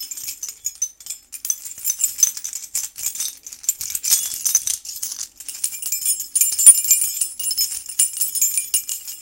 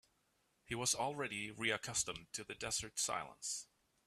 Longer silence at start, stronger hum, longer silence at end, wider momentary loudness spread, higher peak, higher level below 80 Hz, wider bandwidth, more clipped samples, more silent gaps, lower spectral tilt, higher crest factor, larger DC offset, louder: second, 0 s vs 0.7 s; neither; second, 0 s vs 0.4 s; first, 13 LU vs 9 LU; first, 0 dBFS vs -22 dBFS; first, -62 dBFS vs -70 dBFS; first, 17.5 kHz vs 15.5 kHz; neither; neither; second, 4 dB/octave vs -1.5 dB/octave; about the same, 22 dB vs 22 dB; neither; first, -18 LUFS vs -40 LUFS